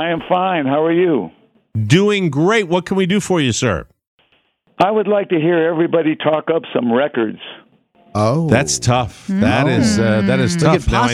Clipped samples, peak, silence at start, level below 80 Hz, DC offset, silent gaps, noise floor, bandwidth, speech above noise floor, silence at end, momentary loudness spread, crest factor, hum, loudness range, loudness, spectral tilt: under 0.1%; 0 dBFS; 0 s; -38 dBFS; under 0.1%; 4.07-4.18 s; -59 dBFS; 14 kHz; 44 dB; 0 s; 7 LU; 16 dB; none; 2 LU; -16 LUFS; -5.5 dB/octave